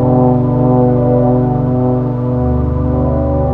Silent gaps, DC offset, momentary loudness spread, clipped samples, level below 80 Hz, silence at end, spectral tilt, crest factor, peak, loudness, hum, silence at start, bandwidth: none; under 0.1%; 4 LU; under 0.1%; -24 dBFS; 0 s; -13 dB/octave; 12 dB; 0 dBFS; -13 LUFS; 50 Hz at -30 dBFS; 0 s; 2.9 kHz